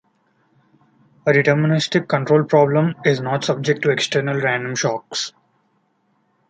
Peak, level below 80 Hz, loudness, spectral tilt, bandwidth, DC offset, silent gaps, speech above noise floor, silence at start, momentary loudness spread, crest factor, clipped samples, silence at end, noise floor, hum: -2 dBFS; -64 dBFS; -18 LUFS; -5 dB/octave; 9.2 kHz; under 0.1%; none; 47 dB; 1.25 s; 8 LU; 18 dB; under 0.1%; 1.2 s; -65 dBFS; none